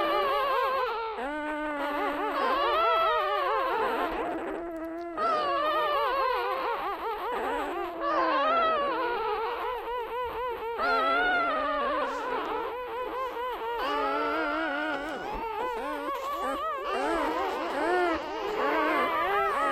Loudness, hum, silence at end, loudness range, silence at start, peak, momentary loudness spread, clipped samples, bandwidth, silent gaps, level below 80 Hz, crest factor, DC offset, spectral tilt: -29 LUFS; none; 0 s; 3 LU; 0 s; -14 dBFS; 8 LU; under 0.1%; 16 kHz; none; -56 dBFS; 16 dB; under 0.1%; -4 dB/octave